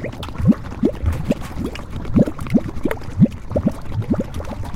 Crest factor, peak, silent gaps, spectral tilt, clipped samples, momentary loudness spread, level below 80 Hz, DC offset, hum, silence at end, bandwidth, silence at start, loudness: 18 dB; -2 dBFS; none; -8.5 dB/octave; under 0.1%; 10 LU; -32 dBFS; under 0.1%; none; 0 s; 16 kHz; 0 s; -21 LUFS